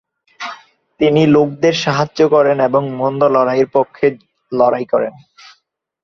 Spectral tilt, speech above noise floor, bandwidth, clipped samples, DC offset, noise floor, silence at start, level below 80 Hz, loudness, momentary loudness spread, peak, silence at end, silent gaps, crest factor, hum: -6.5 dB/octave; 49 dB; 7.4 kHz; under 0.1%; under 0.1%; -63 dBFS; 0.4 s; -56 dBFS; -14 LUFS; 13 LU; 0 dBFS; 0.95 s; none; 14 dB; none